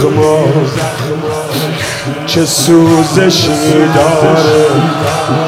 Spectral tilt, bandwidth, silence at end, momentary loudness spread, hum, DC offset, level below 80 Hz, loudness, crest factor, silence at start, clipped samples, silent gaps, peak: -5 dB/octave; 16.5 kHz; 0 s; 9 LU; none; under 0.1%; -44 dBFS; -10 LUFS; 10 dB; 0 s; 1%; none; 0 dBFS